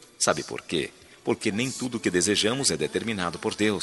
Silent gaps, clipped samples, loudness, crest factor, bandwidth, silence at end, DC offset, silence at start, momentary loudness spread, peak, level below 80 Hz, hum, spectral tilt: none; under 0.1%; -26 LUFS; 22 dB; 12 kHz; 0 s; under 0.1%; 0.2 s; 8 LU; -4 dBFS; -60 dBFS; none; -3 dB/octave